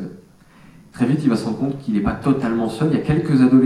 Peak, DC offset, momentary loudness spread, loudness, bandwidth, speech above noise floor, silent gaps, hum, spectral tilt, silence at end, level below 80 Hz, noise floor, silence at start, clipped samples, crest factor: -2 dBFS; under 0.1%; 7 LU; -19 LUFS; 11 kHz; 30 dB; none; none; -8 dB/octave; 0 s; -42 dBFS; -47 dBFS; 0 s; under 0.1%; 16 dB